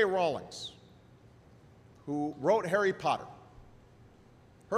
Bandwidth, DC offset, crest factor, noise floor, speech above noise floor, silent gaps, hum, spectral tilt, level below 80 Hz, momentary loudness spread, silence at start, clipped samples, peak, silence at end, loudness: 13.5 kHz; under 0.1%; 20 dB; -59 dBFS; 28 dB; none; none; -5 dB/octave; -66 dBFS; 20 LU; 0 s; under 0.1%; -14 dBFS; 0 s; -32 LUFS